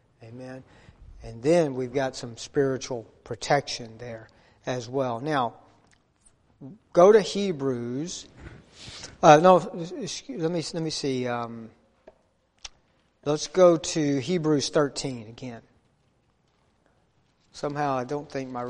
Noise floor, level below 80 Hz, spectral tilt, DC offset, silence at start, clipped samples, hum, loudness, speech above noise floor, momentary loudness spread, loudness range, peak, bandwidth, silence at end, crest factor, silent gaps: -67 dBFS; -58 dBFS; -5 dB/octave; under 0.1%; 0.2 s; under 0.1%; none; -24 LUFS; 43 dB; 23 LU; 9 LU; -2 dBFS; 11 kHz; 0 s; 24 dB; none